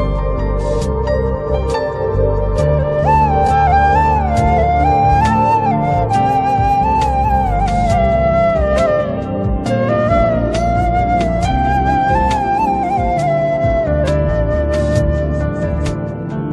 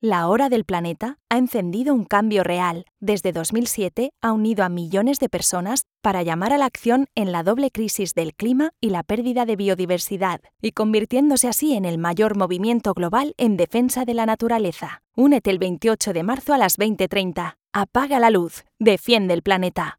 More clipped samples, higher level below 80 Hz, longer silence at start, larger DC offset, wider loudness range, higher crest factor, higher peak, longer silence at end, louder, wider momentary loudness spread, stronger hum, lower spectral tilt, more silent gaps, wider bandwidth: neither; first, -22 dBFS vs -54 dBFS; about the same, 0 s vs 0.05 s; neither; about the same, 3 LU vs 2 LU; second, 12 dB vs 18 dB; about the same, -2 dBFS vs -2 dBFS; about the same, 0 s vs 0.05 s; first, -15 LUFS vs -21 LUFS; about the same, 6 LU vs 7 LU; neither; first, -7.5 dB/octave vs -4.5 dB/octave; neither; second, 11.5 kHz vs 19 kHz